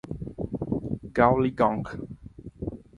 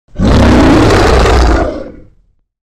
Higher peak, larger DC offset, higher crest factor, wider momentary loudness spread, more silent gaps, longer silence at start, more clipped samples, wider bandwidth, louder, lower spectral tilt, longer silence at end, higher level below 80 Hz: second, -4 dBFS vs 0 dBFS; neither; first, 24 dB vs 8 dB; first, 19 LU vs 9 LU; neither; about the same, 0.05 s vs 0.1 s; neither; second, 10.5 kHz vs 12.5 kHz; second, -26 LUFS vs -8 LUFS; first, -9 dB/octave vs -6 dB/octave; second, 0.2 s vs 0.75 s; second, -46 dBFS vs -14 dBFS